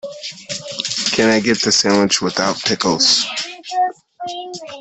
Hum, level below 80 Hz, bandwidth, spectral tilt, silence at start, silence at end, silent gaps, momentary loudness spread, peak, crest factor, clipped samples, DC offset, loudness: none; -56 dBFS; 8.6 kHz; -2.5 dB/octave; 0.05 s; 0 s; none; 16 LU; -2 dBFS; 16 dB; under 0.1%; under 0.1%; -16 LUFS